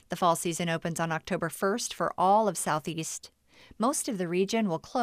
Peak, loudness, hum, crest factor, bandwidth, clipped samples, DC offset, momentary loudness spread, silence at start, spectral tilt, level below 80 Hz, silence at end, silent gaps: -12 dBFS; -29 LUFS; none; 18 dB; 15.5 kHz; under 0.1%; under 0.1%; 8 LU; 0.1 s; -4 dB/octave; -64 dBFS; 0 s; none